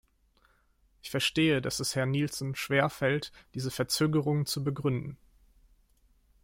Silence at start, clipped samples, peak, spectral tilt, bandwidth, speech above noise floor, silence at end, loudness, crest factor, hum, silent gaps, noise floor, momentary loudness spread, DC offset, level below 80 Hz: 1.05 s; under 0.1%; -12 dBFS; -5 dB/octave; 16.5 kHz; 38 dB; 1.3 s; -30 LUFS; 20 dB; none; none; -67 dBFS; 10 LU; under 0.1%; -60 dBFS